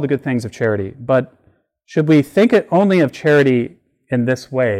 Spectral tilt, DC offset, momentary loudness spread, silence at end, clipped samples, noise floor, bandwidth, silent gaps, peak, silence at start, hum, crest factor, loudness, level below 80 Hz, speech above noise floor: -7.5 dB/octave; under 0.1%; 10 LU; 0 s; under 0.1%; -58 dBFS; 14.5 kHz; none; -4 dBFS; 0 s; none; 12 dB; -16 LUFS; -58 dBFS; 43 dB